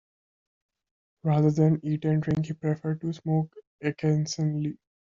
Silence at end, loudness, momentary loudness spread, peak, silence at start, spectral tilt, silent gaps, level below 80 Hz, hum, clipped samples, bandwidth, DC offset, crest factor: 0.3 s; -27 LUFS; 10 LU; -10 dBFS; 1.25 s; -8 dB/octave; 3.67-3.79 s; -62 dBFS; none; under 0.1%; 7.4 kHz; under 0.1%; 18 dB